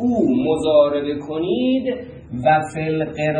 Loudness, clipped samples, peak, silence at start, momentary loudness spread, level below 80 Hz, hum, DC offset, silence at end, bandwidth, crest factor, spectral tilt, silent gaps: -19 LUFS; under 0.1%; -4 dBFS; 0 s; 9 LU; -50 dBFS; none; under 0.1%; 0 s; 10 kHz; 16 dB; -7 dB/octave; none